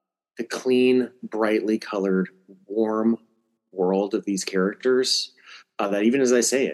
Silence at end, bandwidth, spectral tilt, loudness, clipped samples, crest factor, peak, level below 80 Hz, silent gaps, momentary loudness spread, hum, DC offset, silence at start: 0 s; 12.5 kHz; -4 dB/octave; -23 LUFS; under 0.1%; 16 dB; -8 dBFS; -80 dBFS; none; 12 LU; none; under 0.1%; 0.4 s